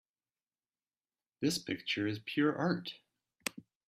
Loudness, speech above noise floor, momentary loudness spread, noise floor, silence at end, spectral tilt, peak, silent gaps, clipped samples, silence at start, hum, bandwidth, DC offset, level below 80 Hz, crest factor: -35 LUFS; over 56 dB; 10 LU; under -90 dBFS; 0.25 s; -4.5 dB/octave; -14 dBFS; none; under 0.1%; 1.4 s; none; 15.5 kHz; under 0.1%; -78 dBFS; 24 dB